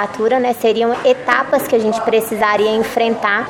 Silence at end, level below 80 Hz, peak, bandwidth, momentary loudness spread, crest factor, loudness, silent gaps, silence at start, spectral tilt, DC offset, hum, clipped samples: 0 s; -54 dBFS; 0 dBFS; 17 kHz; 2 LU; 14 dB; -15 LUFS; none; 0 s; -4 dB/octave; under 0.1%; none; under 0.1%